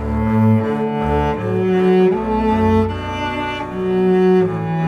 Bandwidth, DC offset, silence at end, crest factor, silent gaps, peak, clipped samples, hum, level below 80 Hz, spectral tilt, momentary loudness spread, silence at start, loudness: 8.6 kHz; under 0.1%; 0 s; 12 dB; none; -4 dBFS; under 0.1%; none; -32 dBFS; -8.5 dB/octave; 8 LU; 0 s; -17 LUFS